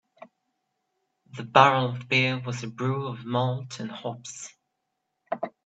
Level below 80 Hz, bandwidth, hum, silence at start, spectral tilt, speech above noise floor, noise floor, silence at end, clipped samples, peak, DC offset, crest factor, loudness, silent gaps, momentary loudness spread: -70 dBFS; 8.4 kHz; none; 0.2 s; -5 dB/octave; 54 dB; -80 dBFS; 0.15 s; under 0.1%; -2 dBFS; under 0.1%; 26 dB; -25 LUFS; none; 21 LU